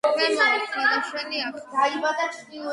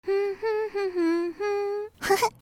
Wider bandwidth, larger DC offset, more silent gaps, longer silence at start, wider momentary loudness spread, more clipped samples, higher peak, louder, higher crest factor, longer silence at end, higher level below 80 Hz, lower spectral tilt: second, 11.5 kHz vs 16.5 kHz; neither; neither; about the same, 0.05 s vs 0.05 s; first, 9 LU vs 5 LU; neither; about the same, -8 dBFS vs -10 dBFS; first, -23 LUFS vs -27 LUFS; about the same, 16 dB vs 16 dB; about the same, 0 s vs 0.1 s; second, -76 dBFS vs -62 dBFS; second, -1.5 dB/octave vs -3.5 dB/octave